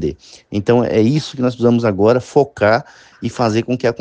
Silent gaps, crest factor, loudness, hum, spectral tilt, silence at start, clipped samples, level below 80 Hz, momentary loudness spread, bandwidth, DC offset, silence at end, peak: none; 16 dB; -16 LUFS; none; -7 dB/octave; 0 s; under 0.1%; -48 dBFS; 10 LU; 9.2 kHz; under 0.1%; 0.05 s; 0 dBFS